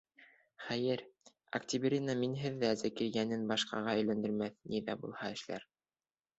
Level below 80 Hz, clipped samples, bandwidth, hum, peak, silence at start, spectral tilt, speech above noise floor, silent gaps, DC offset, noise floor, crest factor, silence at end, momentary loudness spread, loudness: -74 dBFS; under 0.1%; 8 kHz; none; -18 dBFS; 0.2 s; -4.5 dB/octave; over 54 dB; none; under 0.1%; under -90 dBFS; 18 dB; 0.75 s; 8 LU; -37 LUFS